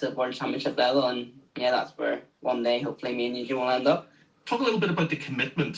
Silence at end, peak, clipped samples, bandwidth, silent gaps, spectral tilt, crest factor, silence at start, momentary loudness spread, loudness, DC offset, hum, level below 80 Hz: 0 s; -10 dBFS; under 0.1%; 8 kHz; none; -6 dB/octave; 18 dB; 0 s; 7 LU; -27 LUFS; under 0.1%; none; -72 dBFS